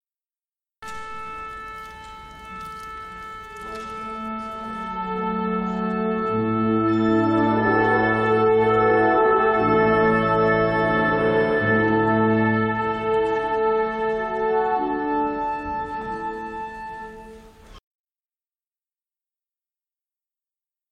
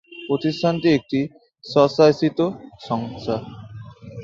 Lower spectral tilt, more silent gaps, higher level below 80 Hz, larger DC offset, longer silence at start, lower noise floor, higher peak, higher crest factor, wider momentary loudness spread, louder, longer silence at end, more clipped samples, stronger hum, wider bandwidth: about the same, -8 dB/octave vs -7 dB/octave; neither; first, -48 dBFS vs -56 dBFS; neither; first, 0.8 s vs 0.1 s; first, under -90 dBFS vs -38 dBFS; second, -8 dBFS vs -2 dBFS; about the same, 16 dB vs 20 dB; second, 18 LU vs 22 LU; about the same, -21 LUFS vs -21 LUFS; first, 3.1 s vs 0 s; neither; neither; first, 9.4 kHz vs 7.6 kHz